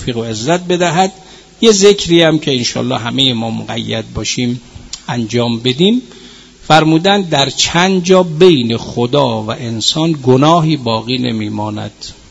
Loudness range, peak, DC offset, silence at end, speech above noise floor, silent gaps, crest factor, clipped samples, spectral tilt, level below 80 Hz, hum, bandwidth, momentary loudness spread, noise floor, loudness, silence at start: 5 LU; 0 dBFS; under 0.1%; 0.2 s; 25 dB; none; 12 dB; 0.4%; -4.5 dB/octave; -42 dBFS; none; 11 kHz; 11 LU; -37 dBFS; -12 LUFS; 0 s